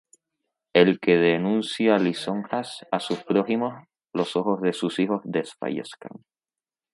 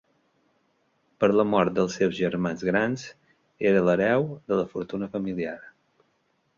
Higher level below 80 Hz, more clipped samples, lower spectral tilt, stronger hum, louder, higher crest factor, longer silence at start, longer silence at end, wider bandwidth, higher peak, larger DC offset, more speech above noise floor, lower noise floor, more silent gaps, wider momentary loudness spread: second, -72 dBFS vs -60 dBFS; neither; about the same, -6 dB/octave vs -6.5 dB/octave; neither; about the same, -24 LUFS vs -25 LUFS; about the same, 22 dB vs 20 dB; second, 0.75 s vs 1.2 s; second, 0.75 s vs 0.9 s; first, 11.5 kHz vs 7.4 kHz; about the same, -4 dBFS vs -6 dBFS; neither; first, over 66 dB vs 46 dB; first, under -90 dBFS vs -70 dBFS; neither; about the same, 12 LU vs 11 LU